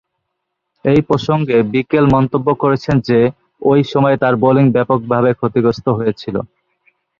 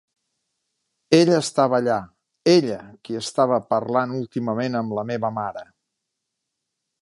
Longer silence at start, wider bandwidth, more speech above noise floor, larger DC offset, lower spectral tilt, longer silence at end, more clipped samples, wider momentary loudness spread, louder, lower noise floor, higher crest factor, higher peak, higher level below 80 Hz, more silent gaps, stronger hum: second, 0.85 s vs 1.1 s; second, 7.2 kHz vs 11.5 kHz; about the same, 61 dB vs 60 dB; neither; first, -8.5 dB/octave vs -5.5 dB/octave; second, 0.75 s vs 1.4 s; neither; second, 7 LU vs 12 LU; first, -14 LUFS vs -21 LUFS; second, -74 dBFS vs -81 dBFS; second, 14 dB vs 20 dB; about the same, 0 dBFS vs -2 dBFS; first, -44 dBFS vs -66 dBFS; neither; neither